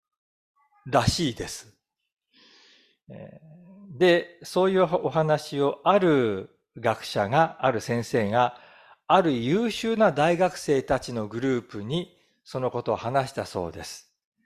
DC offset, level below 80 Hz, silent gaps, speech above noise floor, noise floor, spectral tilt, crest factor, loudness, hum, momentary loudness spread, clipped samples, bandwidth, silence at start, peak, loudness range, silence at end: under 0.1%; -54 dBFS; 2.12-2.17 s; 35 dB; -59 dBFS; -5.5 dB/octave; 20 dB; -25 LUFS; none; 14 LU; under 0.1%; 15 kHz; 0.85 s; -6 dBFS; 7 LU; 0.45 s